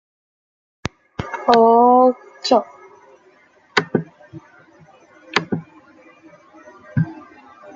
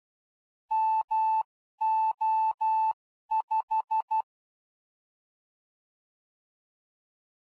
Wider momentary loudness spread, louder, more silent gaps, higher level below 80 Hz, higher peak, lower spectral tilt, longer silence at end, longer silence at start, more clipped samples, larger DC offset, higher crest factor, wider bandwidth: first, 20 LU vs 5 LU; first, -18 LUFS vs -28 LUFS; second, none vs 1.04-1.08 s, 1.45-1.78 s, 2.54-2.58 s, 2.93-3.29 s, 3.43-3.48 s, 3.63-3.68 s, 4.02-4.08 s; first, -54 dBFS vs -88 dBFS; first, 0 dBFS vs -22 dBFS; first, -6 dB/octave vs -0.5 dB/octave; second, 0.6 s vs 3.4 s; first, 1.2 s vs 0.7 s; neither; neither; first, 20 dB vs 10 dB; first, 7.6 kHz vs 4.7 kHz